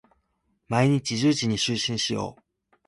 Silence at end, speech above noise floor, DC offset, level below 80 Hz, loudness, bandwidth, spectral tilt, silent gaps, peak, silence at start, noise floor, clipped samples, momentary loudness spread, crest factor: 0.55 s; 48 dB; under 0.1%; -58 dBFS; -24 LUFS; 11.5 kHz; -4.5 dB/octave; none; -8 dBFS; 0.7 s; -72 dBFS; under 0.1%; 7 LU; 18 dB